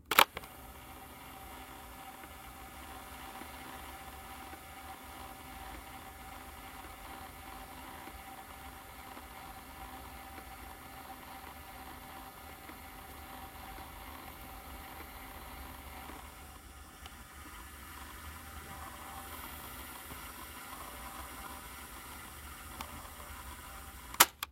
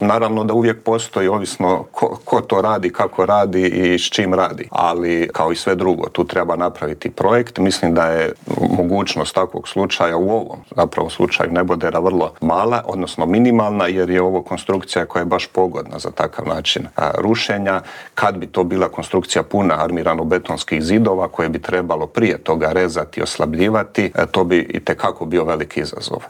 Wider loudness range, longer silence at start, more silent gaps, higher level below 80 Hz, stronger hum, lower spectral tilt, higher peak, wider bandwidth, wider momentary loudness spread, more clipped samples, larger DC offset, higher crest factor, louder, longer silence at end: about the same, 3 LU vs 2 LU; about the same, 0 s vs 0 s; neither; second, -56 dBFS vs -50 dBFS; neither; second, -1.5 dB/octave vs -5 dB/octave; about the same, -2 dBFS vs 0 dBFS; about the same, 16 kHz vs 15.5 kHz; about the same, 4 LU vs 6 LU; neither; neither; first, 40 dB vs 16 dB; second, -42 LUFS vs -18 LUFS; about the same, 0 s vs 0 s